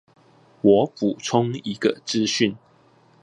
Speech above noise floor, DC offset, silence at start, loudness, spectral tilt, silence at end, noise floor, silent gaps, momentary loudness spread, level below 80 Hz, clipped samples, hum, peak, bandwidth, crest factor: 35 dB; under 0.1%; 0.65 s; -22 LUFS; -5 dB/octave; 0.65 s; -56 dBFS; none; 6 LU; -62 dBFS; under 0.1%; none; -4 dBFS; 11 kHz; 20 dB